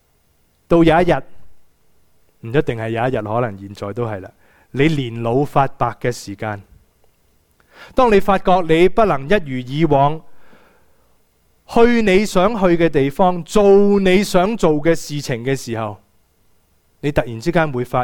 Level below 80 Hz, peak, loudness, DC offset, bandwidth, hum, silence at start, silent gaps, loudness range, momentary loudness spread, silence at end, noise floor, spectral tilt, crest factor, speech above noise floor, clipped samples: -36 dBFS; 0 dBFS; -17 LUFS; under 0.1%; 18 kHz; none; 0.7 s; none; 7 LU; 13 LU; 0 s; -60 dBFS; -6.5 dB/octave; 16 dB; 44 dB; under 0.1%